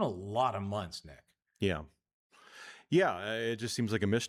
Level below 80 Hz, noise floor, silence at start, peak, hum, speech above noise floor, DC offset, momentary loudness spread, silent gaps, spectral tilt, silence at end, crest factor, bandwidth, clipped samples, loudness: -64 dBFS; -53 dBFS; 0 s; -16 dBFS; none; 21 dB; under 0.1%; 17 LU; 2.13-2.30 s; -5.5 dB/octave; 0 s; 18 dB; 15 kHz; under 0.1%; -33 LUFS